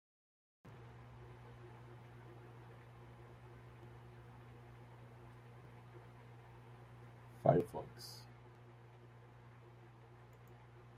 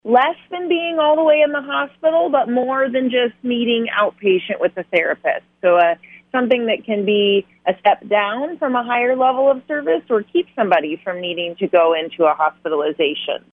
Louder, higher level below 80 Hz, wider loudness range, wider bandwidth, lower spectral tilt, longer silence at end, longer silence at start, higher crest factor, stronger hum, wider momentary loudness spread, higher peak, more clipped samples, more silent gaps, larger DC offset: second, -43 LUFS vs -18 LUFS; about the same, -70 dBFS vs -70 dBFS; first, 15 LU vs 1 LU; first, 15.5 kHz vs 3.9 kHz; about the same, -7.5 dB/octave vs -7.5 dB/octave; second, 0 s vs 0.15 s; first, 0.65 s vs 0.05 s; first, 32 dB vs 16 dB; first, 60 Hz at -60 dBFS vs none; first, 13 LU vs 7 LU; second, -16 dBFS vs -2 dBFS; neither; neither; neither